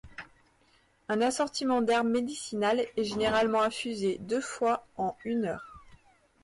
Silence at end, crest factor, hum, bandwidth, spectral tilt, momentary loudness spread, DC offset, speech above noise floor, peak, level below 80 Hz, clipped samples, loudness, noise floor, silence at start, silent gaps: 0.5 s; 14 dB; none; 11.5 kHz; -4 dB/octave; 9 LU; under 0.1%; 37 dB; -18 dBFS; -62 dBFS; under 0.1%; -29 LUFS; -66 dBFS; 0.05 s; none